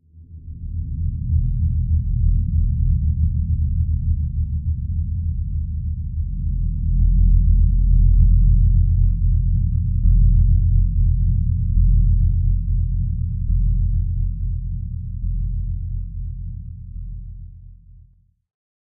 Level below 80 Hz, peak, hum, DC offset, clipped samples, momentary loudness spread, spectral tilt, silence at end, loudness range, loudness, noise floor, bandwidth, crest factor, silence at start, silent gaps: -20 dBFS; -4 dBFS; none; under 0.1%; under 0.1%; 14 LU; -16 dB/octave; 1.1 s; 10 LU; -21 LUFS; -53 dBFS; 0.3 kHz; 14 dB; 0.15 s; none